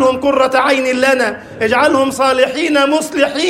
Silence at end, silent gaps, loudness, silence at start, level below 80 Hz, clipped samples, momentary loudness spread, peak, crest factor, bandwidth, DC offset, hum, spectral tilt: 0 s; none; -13 LUFS; 0 s; -52 dBFS; under 0.1%; 4 LU; 0 dBFS; 12 dB; 16 kHz; under 0.1%; none; -3 dB/octave